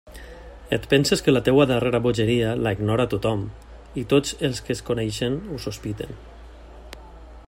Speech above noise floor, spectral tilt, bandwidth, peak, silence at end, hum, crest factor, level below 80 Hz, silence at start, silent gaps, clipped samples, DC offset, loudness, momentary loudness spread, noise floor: 20 dB; -5.5 dB/octave; 16 kHz; -4 dBFS; 0.05 s; none; 20 dB; -44 dBFS; 0.05 s; none; under 0.1%; under 0.1%; -22 LUFS; 24 LU; -42 dBFS